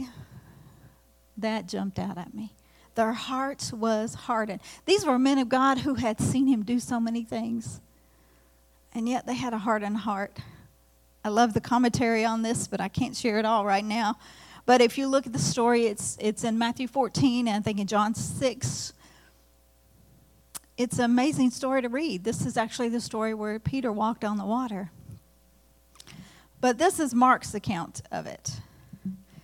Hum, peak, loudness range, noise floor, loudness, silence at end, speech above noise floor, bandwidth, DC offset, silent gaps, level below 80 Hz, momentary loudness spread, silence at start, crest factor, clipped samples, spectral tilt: none; -8 dBFS; 7 LU; -61 dBFS; -27 LUFS; 0.05 s; 34 dB; 16 kHz; under 0.1%; none; -60 dBFS; 14 LU; 0 s; 20 dB; under 0.1%; -4.5 dB/octave